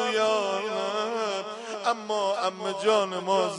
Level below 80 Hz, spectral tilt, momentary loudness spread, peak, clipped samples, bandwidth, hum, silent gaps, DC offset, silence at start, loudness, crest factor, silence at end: -82 dBFS; -3 dB/octave; 6 LU; -10 dBFS; under 0.1%; 11 kHz; none; none; under 0.1%; 0 s; -27 LUFS; 16 dB; 0 s